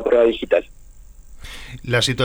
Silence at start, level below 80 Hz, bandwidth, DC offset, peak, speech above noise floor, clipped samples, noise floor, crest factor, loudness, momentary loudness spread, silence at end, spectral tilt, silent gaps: 0 s; -40 dBFS; over 20 kHz; under 0.1%; -6 dBFS; 23 dB; under 0.1%; -41 dBFS; 16 dB; -19 LUFS; 21 LU; 0 s; -4.5 dB/octave; none